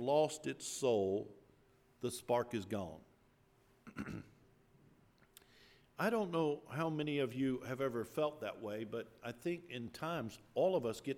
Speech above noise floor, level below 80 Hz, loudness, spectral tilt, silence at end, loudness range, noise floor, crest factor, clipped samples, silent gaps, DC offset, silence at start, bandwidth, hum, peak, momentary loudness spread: 32 dB; -74 dBFS; -39 LUFS; -5.5 dB/octave; 0 s; 7 LU; -71 dBFS; 20 dB; under 0.1%; none; under 0.1%; 0 s; 17.5 kHz; none; -20 dBFS; 13 LU